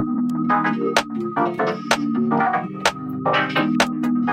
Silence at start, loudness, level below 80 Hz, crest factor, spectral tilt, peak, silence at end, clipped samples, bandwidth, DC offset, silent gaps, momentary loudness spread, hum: 0 s; -21 LUFS; -56 dBFS; 20 dB; -4.5 dB/octave; 0 dBFS; 0 s; under 0.1%; 15 kHz; under 0.1%; none; 4 LU; none